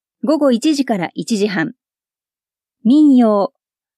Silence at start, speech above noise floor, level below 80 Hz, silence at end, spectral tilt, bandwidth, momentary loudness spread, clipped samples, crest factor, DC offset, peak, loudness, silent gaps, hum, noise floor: 0.25 s; over 76 dB; -74 dBFS; 0.5 s; -5.5 dB/octave; 12.5 kHz; 11 LU; under 0.1%; 12 dB; under 0.1%; -4 dBFS; -15 LUFS; none; none; under -90 dBFS